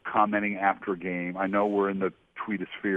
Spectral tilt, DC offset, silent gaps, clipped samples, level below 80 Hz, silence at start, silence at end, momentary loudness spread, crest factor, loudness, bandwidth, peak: -8.5 dB/octave; under 0.1%; none; under 0.1%; -66 dBFS; 0.05 s; 0 s; 8 LU; 20 dB; -28 LUFS; 3.9 kHz; -8 dBFS